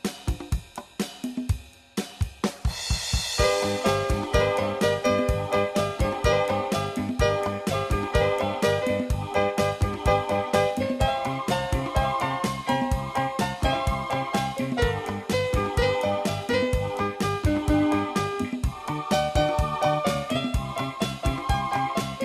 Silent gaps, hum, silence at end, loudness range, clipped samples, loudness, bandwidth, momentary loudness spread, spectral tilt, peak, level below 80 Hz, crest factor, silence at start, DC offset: none; none; 0 s; 2 LU; under 0.1%; -26 LUFS; 15.5 kHz; 7 LU; -5 dB/octave; -8 dBFS; -34 dBFS; 18 dB; 0.05 s; under 0.1%